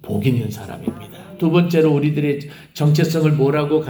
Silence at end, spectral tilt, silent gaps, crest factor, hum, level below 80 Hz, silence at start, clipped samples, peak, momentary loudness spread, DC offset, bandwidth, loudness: 0 s; -7.5 dB/octave; none; 14 dB; none; -56 dBFS; 0.05 s; under 0.1%; -2 dBFS; 13 LU; under 0.1%; over 20 kHz; -18 LUFS